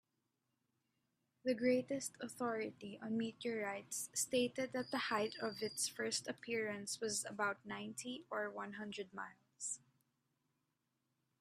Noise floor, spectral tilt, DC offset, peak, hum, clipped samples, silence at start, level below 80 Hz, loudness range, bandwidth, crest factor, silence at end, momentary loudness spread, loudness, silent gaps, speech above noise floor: -87 dBFS; -2.5 dB/octave; under 0.1%; -24 dBFS; none; under 0.1%; 1.45 s; -86 dBFS; 7 LU; 15.5 kHz; 20 dB; 1.65 s; 10 LU; -42 LUFS; none; 45 dB